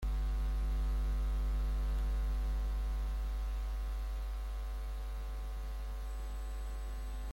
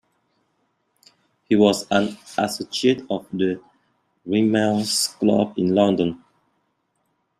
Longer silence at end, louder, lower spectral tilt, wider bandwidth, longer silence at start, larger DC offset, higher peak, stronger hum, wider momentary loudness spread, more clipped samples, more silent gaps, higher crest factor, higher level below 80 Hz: second, 0 s vs 1.25 s; second, -40 LUFS vs -21 LUFS; first, -6 dB/octave vs -4.5 dB/octave; first, 16 kHz vs 14.5 kHz; second, 0 s vs 1.5 s; neither; second, -28 dBFS vs -2 dBFS; neither; about the same, 7 LU vs 9 LU; neither; neither; second, 8 dB vs 20 dB; first, -36 dBFS vs -62 dBFS